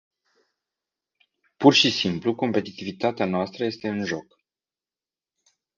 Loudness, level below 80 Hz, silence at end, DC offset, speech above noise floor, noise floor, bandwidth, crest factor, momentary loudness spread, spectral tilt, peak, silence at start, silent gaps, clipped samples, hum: -23 LUFS; -62 dBFS; 1.55 s; under 0.1%; over 67 dB; under -90 dBFS; 7.4 kHz; 24 dB; 12 LU; -4.5 dB/octave; -2 dBFS; 1.6 s; none; under 0.1%; none